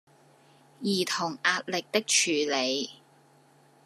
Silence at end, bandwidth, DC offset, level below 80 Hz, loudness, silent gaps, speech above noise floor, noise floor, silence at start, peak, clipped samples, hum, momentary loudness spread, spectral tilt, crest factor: 0.9 s; 14 kHz; under 0.1%; -84 dBFS; -27 LUFS; none; 32 dB; -60 dBFS; 0.8 s; -8 dBFS; under 0.1%; none; 9 LU; -2 dB/octave; 22 dB